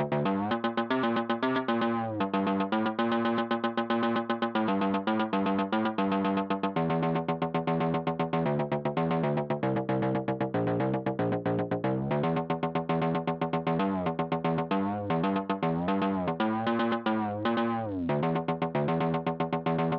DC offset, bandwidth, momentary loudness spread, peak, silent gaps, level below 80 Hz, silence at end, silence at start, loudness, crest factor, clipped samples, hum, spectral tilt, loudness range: under 0.1%; 5.6 kHz; 2 LU; -16 dBFS; none; -62 dBFS; 0 s; 0 s; -29 LUFS; 12 dB; under 0.1%; none; -5.5 dB/octave; 1 LU